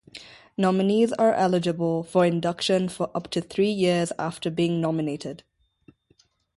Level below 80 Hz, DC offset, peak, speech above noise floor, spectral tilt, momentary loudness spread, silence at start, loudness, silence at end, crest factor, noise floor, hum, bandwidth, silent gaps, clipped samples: -64 dBFS; under 0.1%; -8 dBFS; 41 dB; -6 dB/octave; 12 LU; 0.15 s; -24 LUFS; 1.2 s; 16 dB; -64 dBFS; none; 11.5 kHz; none; under 0.1%